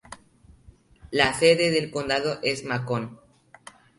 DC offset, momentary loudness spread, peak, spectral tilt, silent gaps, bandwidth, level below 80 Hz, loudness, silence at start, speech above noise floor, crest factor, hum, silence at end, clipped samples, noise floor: under 0.1%; 11 LU; -4 dBFS; -4 dB/octave; none; 11.5 kHz; -56 dBFS; -23 LUFS; 0.1 s; 31 dB; 22 dB; none; 0.85 s; under 0.1%; -55 dBFS